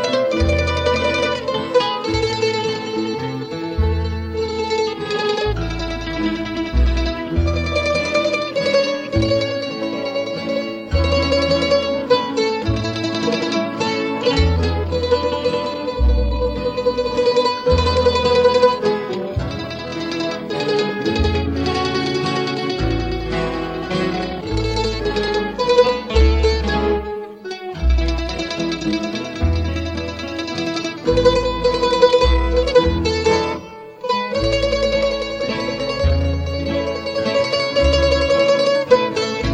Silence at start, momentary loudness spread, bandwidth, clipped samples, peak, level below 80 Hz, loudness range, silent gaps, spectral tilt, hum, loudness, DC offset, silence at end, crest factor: 0 s; 8 LU; 9.4 kHz; under 0.1%; -2 dBFS; -26 dBFS; 4 LU; none; -5.5 dB/octave; none; -19 LUFS; under 0.1%; 0 s; 16 dB